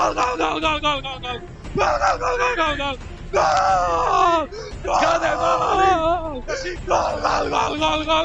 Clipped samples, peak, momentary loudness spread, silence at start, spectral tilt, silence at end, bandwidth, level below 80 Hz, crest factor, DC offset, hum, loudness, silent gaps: under 0.1%; -6 dBFS; 10 LU; 0 s; -3.5 dB/octave; 0 s; 8.6 kHz; -36 dBFS; 14 dB; under 0.1%; none; -20 LUFS; none